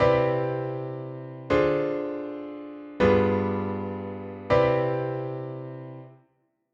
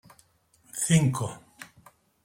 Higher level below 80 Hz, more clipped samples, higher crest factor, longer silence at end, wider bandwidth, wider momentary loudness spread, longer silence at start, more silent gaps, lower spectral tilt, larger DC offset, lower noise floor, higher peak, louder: first, -50 dBFS vs -62 dBFS; neither; about the same, 18 dB vs 20 dB; about the same, 0.6 s vs 0.6 s; second, 7.4 kHz vs 16.5 kHz; second, 17 LU vs 25 LU; second, 0 s vs 0.75 s; neither; first, -8.5 dB/octave vs -5 dB/octave; neither; first, -70 dBFS vs -63 dBFS; about the same, -8 dBFS vs -8 dBFS; about the same, -26 LUFS vs -26 LUFS